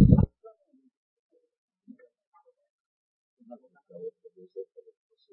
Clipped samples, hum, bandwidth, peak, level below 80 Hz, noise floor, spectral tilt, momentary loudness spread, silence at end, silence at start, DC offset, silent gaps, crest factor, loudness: under 0.1%; none; 4 kHz; -4 dBFS; -40 dBFS; -60 dBFS; -13.5 dB/octave; 29 LU; 0.7 s; 0 s; under 0.1%; 0.97-1.30 s, 1.58-1.68 s, 2.27-2.32 s, 2.70-3.37 s; 26 dB; -27 LUFS